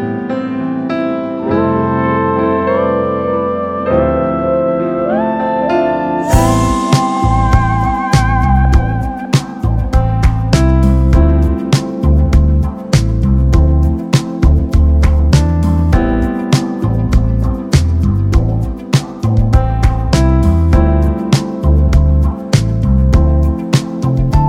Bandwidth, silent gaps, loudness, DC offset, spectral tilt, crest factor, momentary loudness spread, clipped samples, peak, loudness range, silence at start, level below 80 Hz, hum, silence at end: 13 kHz; none; -13 LUFS; under 0.1%; -7 dB/octave; 12 dB; 5 LU; under 0.1%; 0 dBFS; 2 LU; 0 s; -16 dBFS; none; 0 s